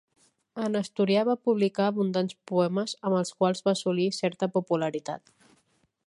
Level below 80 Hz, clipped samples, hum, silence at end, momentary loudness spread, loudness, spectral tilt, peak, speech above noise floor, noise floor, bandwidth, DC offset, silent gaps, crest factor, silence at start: -76 dBFS; under 0.1%; none; 0.9 s; 7 LU; -27 LUFS; -6 dB/octave; -10 dBFS; 43 dB; -70 dBFS; 11.5 kHz; under 0.1%; none; 16 dB; 0.55 s